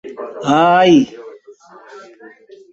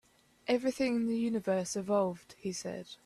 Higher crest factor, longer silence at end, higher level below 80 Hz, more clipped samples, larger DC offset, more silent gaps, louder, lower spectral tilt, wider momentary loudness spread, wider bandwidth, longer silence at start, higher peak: about the same, 16 dB vs 16 dB; first, 0.45 s vs 0.1 s; first, -60 dBFS vs -70 dBFS; neither; neither; neither; first, -13 LUFS vs -33 LUFS; about the same, -5.5 dB/octave vs -5 dB/octave; first, 19 LU vs 10 LU; second, 8 kHz vs 13.5 kHz; second, 0.05 s vs 0.45 s; first, -2 dBFS vs -18 dBFS